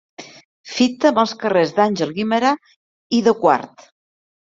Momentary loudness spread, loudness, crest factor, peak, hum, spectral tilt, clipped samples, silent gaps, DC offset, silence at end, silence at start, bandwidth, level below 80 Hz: 13 LU; -18 LUFS; 18 dB; -2 dBFS; none; -5 dB/octave; under 0.1%; 0.45-0.64 s, 2.76-3.10 s; under 0.1%; 0.85 s; 0.2 s; 7.8 kHz; -64 dBFS